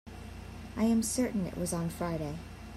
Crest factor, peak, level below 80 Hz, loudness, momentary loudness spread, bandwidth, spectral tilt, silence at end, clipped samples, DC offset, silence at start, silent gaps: 16 dB; -18 dBFS; -50 dBFS; -32 LUFS; 17 LU; 15.5 kHz; -5.5 dB/octave; 0 s; under 0.1%; under 0.1%; 0.05 s; none